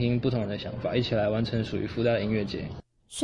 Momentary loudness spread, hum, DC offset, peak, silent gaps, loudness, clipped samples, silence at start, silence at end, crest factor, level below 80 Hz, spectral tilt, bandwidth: 11 LU; none; under 0.1%; -12 dBFS; none; -28 LUFS; under 0.1%; 0 s; 0 s; 16 dB; -50 dBFS; -6.5 dB/octave; 11.5 kHz